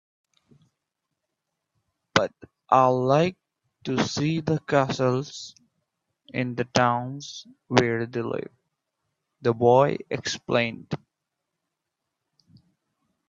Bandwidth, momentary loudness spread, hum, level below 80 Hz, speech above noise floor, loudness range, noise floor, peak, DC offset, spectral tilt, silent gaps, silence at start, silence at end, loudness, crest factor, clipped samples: 7.8 kHz; 17 LU; none; -64 dBFS; 59 dB; 3 LU; -83 dBFS; 0 dBFS; under 0.1%; -5.5 dB/octave; none; 2.15 s; 2.35 s; -24 LUFS; 26 dB; under 0.1%